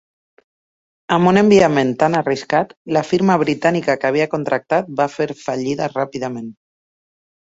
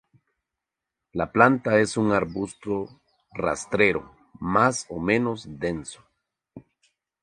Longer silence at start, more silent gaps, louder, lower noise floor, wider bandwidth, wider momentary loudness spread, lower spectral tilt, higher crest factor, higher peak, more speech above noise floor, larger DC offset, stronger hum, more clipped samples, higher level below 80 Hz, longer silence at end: about the same, 1.1 s vs 1.15 s; first, 2.77-2.85 s vs none; first, -17 LUFS vs -24 LUFS; first, under -90 dBFS vs -86 dBFS; second, 8 kHz vs 11.5 kHz; second, 11 LU vs 16 LU; about the same, -6 dB/octave vs -5.5 dB/octave; second, 16 dB vs 26 dB; about the same, -2 dBFS vs 0 dBFS; first, over 73 dB vs 63 dB; neither; neither; neither; about the same, -56 dBFS vs -54 dBFS; first, 0.95 s vs 0.65 s